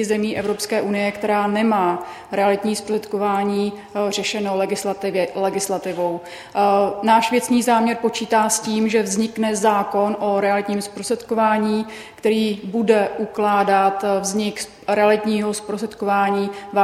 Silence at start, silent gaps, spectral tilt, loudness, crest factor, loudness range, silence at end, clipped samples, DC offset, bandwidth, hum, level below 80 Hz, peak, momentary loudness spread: 0 s; none; -4 dB/octave; -20 LUFS; 18 dB; 4 LU; 0 s; under 0.1%; under 0.1%; 14.5 kHz; none; -60 dBFS; -2 dBFS; 8 LU